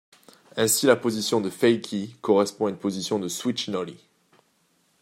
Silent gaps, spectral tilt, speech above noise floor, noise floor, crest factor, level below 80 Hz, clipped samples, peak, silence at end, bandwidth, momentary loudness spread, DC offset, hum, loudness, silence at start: none; -3.5 dB/octave; 43 dB; -67 dBFS; 22 dB; -72 dBFS; under 0.1%; -4 dBFS; 1.05 s; 16 kHz; 11 LU; under 0.1%; none; -24 LUFS; 0.55 s